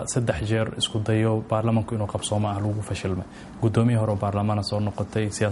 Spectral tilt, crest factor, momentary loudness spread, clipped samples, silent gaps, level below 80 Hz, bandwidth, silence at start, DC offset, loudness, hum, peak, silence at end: -6 dB/octave; 16 dB; 6 LU; under 0.1%; none; -48 dBFS; 11.5 kHz; 0 s; under 0.1%; -25 LUFS; none; -8 dBFS; 0 s